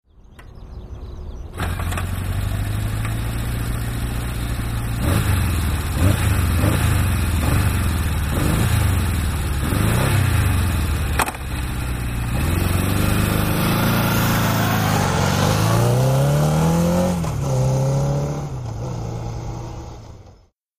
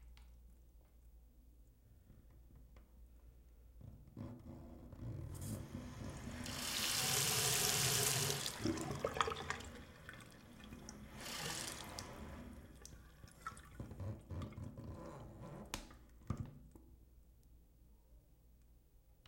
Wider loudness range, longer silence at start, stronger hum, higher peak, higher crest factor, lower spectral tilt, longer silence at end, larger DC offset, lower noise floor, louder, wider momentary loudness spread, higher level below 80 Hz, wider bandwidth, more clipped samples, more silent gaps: second, 7 LU vs 20 LU; first, 0.4 s vs 0 s; neither; first, -2 dBFS vs -16 dBFS; second, 18 dB vs 30 dB; first, -5.5 dB/octave vs -2.5 dB/octave; first, 0.5 s vs 0.15 s; neither; second, -50 dBFS vs -67 dBFS; first, -20 LUFS vs -41 LUFS; second, 11 LU vs 24 LU; first, -28 dBFS vs -60 dBFS; about the same, 15.5 kHz vs 16.5 kHz; neither; neither